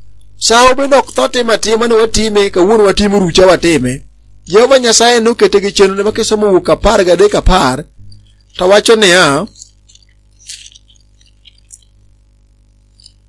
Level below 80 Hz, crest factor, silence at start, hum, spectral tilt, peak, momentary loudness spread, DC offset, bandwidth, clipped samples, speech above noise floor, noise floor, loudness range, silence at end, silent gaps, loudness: -28 dBFS; 10 dB; 0.05 s; 50 Hz at -40 dBFS; -3.5 dB/octave; 0 dBFS; 10 LU; under 0.1%; 12 kHz; 0.6%; 38 dB; -47 dBFS; 3 LU; 2.75 s; none; -9 LUFS